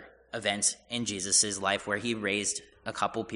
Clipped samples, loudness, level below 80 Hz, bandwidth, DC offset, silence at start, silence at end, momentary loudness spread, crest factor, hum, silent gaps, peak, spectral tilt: under 0.1%; -29 LUFS; -64 dBFS; 11 kHz; under 0.1%; 0 s; 0 s; 10 LU; 20 dB; none; none; -10 dBFS; -1.5 dB/octave